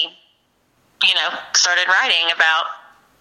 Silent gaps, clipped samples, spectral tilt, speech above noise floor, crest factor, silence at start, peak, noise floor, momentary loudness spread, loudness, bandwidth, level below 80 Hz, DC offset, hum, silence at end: none; under 0.1%; 3 dB/octave; 45 dB; 18 dB; 0 s; -2 dBFS; -62 dBFS; 7 LU; -15 LUFS; 15.5 kHz; -76 dBFS; under 0.1%; none; 0.45 s